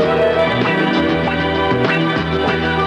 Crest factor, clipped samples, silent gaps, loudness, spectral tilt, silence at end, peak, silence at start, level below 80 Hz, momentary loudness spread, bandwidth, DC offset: 10 dB; under 0.1%; none; -16 LUFS; -7 dB/octave; 0 s; -6 dBFS; 0 s; -36 dBFS; 3 LU; 9.8 kHz; under 0.1%